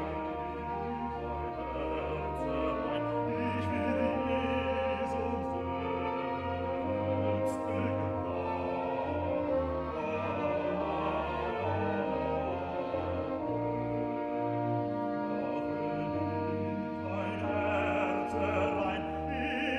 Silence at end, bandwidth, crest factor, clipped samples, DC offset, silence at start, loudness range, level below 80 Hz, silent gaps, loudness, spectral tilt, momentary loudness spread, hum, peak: 0 s; 11.5 kHz; 16 dB; under 0.1%; under 0.1%; 0 s; 2 LU; -50 dBFS; none; -33 LUFS; -7.5 dB/octave; 5 LU; none; -18 dBFS